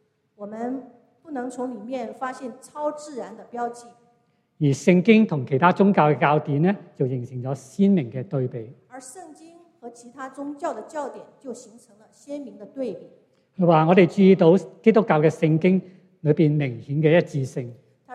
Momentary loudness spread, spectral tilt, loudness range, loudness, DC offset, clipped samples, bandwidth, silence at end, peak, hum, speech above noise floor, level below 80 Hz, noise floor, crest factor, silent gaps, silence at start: 22 LU; -7.5 dB/octave; 16 LU; -21 LUFS; under 0.1%; under 0.1%; 10.5 kHz; 0 s; -2 dBFS; none; 44 dB; -70 dBFS; -65 dBFS; 20 dB; none; 0.4 s